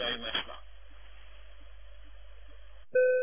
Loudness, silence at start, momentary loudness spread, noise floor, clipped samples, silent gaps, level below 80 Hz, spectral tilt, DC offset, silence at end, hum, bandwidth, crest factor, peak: -31 LUFS; 0 s; 26 LU; -53 dBFS; under 0.1%; none; -54 dBFS; -6.5 dB/octave; 0.5%; 0 s; none; 3.6 kHz; 18 dB; -16 dBFS